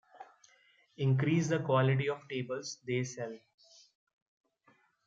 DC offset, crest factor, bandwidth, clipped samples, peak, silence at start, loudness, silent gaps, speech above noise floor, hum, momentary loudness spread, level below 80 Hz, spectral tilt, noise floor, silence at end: under 0.1%; 18 dB; 7.6 kHz; under 0.1%; -16 dBFS; 0.15 s; -33 LUFS; none; 38 dB; none; 12 LU; -76 dBFS; -6.5 dB/octave; -70 dBFS; 1.7 s